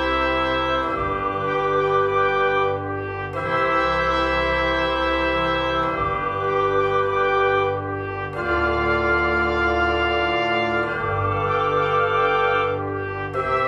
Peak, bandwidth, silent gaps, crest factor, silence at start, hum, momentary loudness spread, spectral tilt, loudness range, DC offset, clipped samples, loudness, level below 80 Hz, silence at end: -8 dBFS; 8.4 kHz; none; 14 dB; 0 s; none; 7 LU; -6.5 dB/octave; 1 LU; under 0.1%; under 0.1%; -21 LUFS; -38 dBFS; 0 s